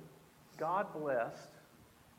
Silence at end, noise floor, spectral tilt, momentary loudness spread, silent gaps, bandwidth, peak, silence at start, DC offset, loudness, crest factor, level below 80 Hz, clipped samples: 0.35 s; -63 dBFS; -6 dB/octave; 22 LU; none; 16.5 kHz; -22 dBFS; 0 s; under 0.1%; -38 LUFS; 18 dB; -78 dBFS; under 0.1%